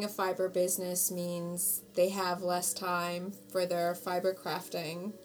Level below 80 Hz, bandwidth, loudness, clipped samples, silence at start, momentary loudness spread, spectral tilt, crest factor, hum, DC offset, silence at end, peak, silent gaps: -78 dBFS; over 20 kHz; -33 LUFS; under 0.1%; 0 s; 7 LU; -3.5 dB/octave; 16 dB; none; under 0.1%; 0 s; -18 dBFS; none